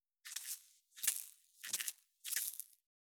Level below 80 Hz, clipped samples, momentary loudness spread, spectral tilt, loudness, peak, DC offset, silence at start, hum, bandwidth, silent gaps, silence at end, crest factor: under -90 dBFS; under 0.1%; 16 LU; 4 dB/octave; -42 LUFS; -12 dBFS; under 0.1%; 0.25 s; none; over 20 kHz; none; 0.5 s; 34 dB